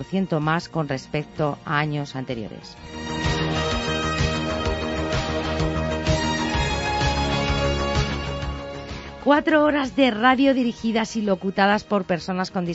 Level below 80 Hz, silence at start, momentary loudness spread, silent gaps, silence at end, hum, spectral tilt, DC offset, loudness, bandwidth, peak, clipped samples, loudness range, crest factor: -34 dBFS; 0 s; 11 LU; none; 0 s; none; -5.5 dB/octave; under 0.1%; -23 LUFS; 8 kHz; -4 dBFS; under 0.1%; 6 LU; 20 dB